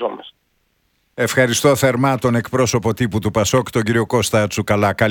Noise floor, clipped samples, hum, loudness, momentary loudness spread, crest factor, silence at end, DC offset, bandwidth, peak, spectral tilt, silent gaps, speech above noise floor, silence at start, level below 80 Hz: -65 dBFS; under 0.1%; none; -17 LUFS; 5 LU; 16 dB; 0 s; under 0.1%; 19 kHz; -2 dBFS; -5 dB/octave; none; 48 dB; 0 s; -46 dBFS